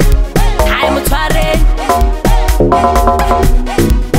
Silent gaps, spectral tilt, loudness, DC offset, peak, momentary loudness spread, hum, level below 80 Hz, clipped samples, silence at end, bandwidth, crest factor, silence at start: none; -5.5 dB/octave; -12 LUFS; under 0.1%; 0 dBFS; 3 LU; none; -12 dBFS; under 0.1%; 0 s; 16.5 kHz; 10 dB; 0 s